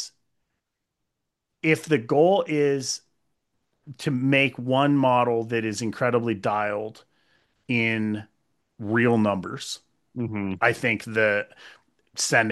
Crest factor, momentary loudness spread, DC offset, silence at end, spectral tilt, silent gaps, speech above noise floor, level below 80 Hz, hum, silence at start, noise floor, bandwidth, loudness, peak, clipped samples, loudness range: 20 dB; 13 LU; under 0.1%; 0 s; -5 dB/octave; none; 58 dB; -70 dBFS; none; 0 s; -82 dBFS; 12.5 kHz; -24 LUFS; -4 dBFS; under 0.1%; 3 LU